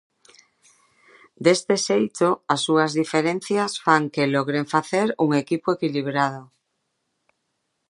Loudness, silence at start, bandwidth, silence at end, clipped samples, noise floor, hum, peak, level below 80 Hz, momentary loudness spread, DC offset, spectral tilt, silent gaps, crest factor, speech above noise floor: -22 LUFS; 1.4 s; 11.5 kHz; 1.45 s; under 0.1%; -75 dBFS; none; -2 dBFS; -72 dBFS; 4 LU; under 0.1%; -4.5 dB/octave; none; 22 dB; 54 dB